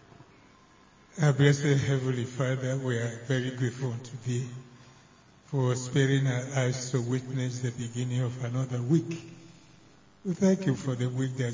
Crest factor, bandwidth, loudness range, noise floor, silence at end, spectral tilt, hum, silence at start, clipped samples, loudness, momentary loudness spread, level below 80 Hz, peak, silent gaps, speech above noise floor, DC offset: 22 dB; 7.6 kHz; 4 LU; -58 dBFS; 0 s; -6.5 dB/octave; none; 1.15 s; under 0.1%; -29 LUFS; 10 LU; -64 dBFS; -8 dBFS; none; 30 dB; under 0.1%